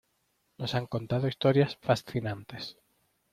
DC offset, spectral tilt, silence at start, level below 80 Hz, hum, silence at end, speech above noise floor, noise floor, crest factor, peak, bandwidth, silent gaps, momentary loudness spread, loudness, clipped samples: under 0.1%; -7 dB/octave; 0.6 s; -62 dBFS; none; 0.6 s; 45 dB; -75 dBFS; 20 dB; -10 dBFS; 14.5 kHz; none; 15 LU; -30 LUFS; under 0.1%